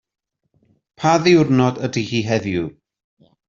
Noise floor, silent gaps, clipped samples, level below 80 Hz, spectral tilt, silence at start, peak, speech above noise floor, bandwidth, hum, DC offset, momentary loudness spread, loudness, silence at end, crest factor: -64 dBFS; none; under 0.1%; -54 dBFS; -6 dB/octave; 1 s; -2 dBFS; 47 dB; 7.4 kHz; none; under 0.1%; 11 LU; -18 LUFS; 0.75 s; 18 dB